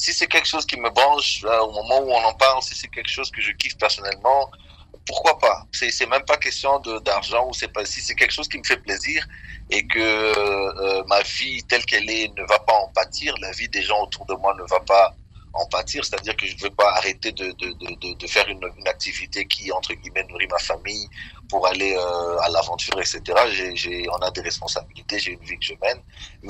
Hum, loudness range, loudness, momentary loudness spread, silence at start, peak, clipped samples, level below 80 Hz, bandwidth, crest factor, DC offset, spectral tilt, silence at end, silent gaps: none; 4 LU; -21 LUFS; 10 LU; 0 s; -2 dBFS; under 0.1%; -46 dBFS; 15.5 kHz; 20 dB; under 0.1%; -1.5 dB/octave; 0 s; none